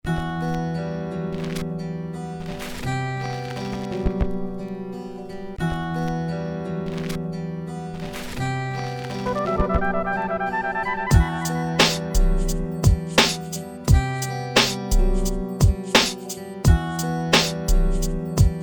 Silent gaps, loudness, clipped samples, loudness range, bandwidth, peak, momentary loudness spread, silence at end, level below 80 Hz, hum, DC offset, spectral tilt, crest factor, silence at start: none; -24 LUFS; under 0.1%; 8 LU; over 20 kHz; -2 dBFS; 13 LU; 0 s; -26 dBFS; none; 0.2%; -4.5 dB/octave; 20 dB; 0.05 s